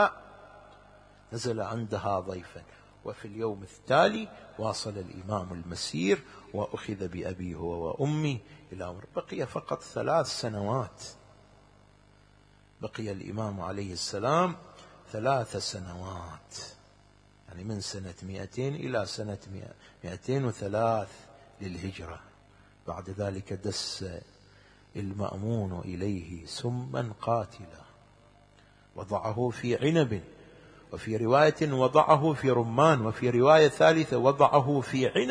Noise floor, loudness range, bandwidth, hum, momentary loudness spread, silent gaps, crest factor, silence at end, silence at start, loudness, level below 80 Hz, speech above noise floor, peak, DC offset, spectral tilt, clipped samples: -59 dBFS; 13 LU; 10.5 kHz; 50 Hz at -60 dBFS; 20 LU; none; 24 dB; 0 s; 0 s; -29 LUFS; -60 dBFS; 30 dB; -6 dBFS; under 0.1%; -5.5 dB/octave; under 0.1%